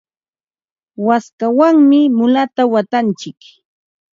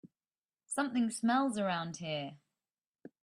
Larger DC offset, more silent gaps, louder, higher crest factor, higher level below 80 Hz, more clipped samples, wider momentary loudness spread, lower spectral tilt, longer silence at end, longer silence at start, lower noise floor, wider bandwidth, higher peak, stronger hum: neither; second, 1.33-1.38 s vs 0.38-0.49 s; first, -13 LUFS vs -34 LUFS; about the same, 14 dB vs 18 dB; first, -68 dBFS vs -80 dBFS; neither; about the same, 11 LU vs 9 LU; first, -6.5 dB/octave vs -4.5 dB/octave; about the same, 0.85 s vs 0.9 s; first, 1 s vs 0.05 s; about the same, under -90 dBFS vs under -90 dBFS; second, 7.6 kHz vs 13.5 kHz; first, 0 dBFS vs -18 dBFS; neither